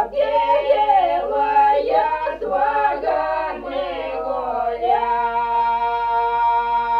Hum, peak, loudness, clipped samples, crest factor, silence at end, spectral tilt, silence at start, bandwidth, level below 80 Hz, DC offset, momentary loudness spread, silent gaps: none; -6 dBFS; -19 LUFS; under 0.1%; 14 dB; 0 s; -5.5 dB/octave; 0 s; 6 kHz; -46 dBFS; under 0.1%; 8 LU; none